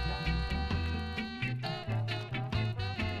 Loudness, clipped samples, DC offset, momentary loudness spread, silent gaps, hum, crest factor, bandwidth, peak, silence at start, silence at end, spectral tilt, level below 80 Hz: -35 LUFS; under 0.1%; under 0.1%; 3 LU; none; none; 14 dB; 11.5 kHz; -20 dBFS; 0 s; 0 s; -6.5 dB/octave; -40 dBFS